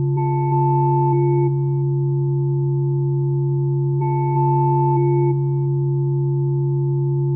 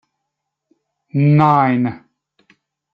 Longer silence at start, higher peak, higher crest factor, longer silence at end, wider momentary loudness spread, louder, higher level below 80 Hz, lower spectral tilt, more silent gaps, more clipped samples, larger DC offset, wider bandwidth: second, 0 s vs 1.15 s; second, -8 dBFS vs -2 dBFS; second, 10 dB vs 16 dB; second, 0 s vs 0.95 s; second, 3 LU vs 11 LU; second, -19 LUFS vs -15 LUFS; about the same, -58 dBFS vs -60 dBFS; first, -17 dB/octave vs -10 dB/octave; neither; neither; neither; second, 2.4 kHz vs 5 kHz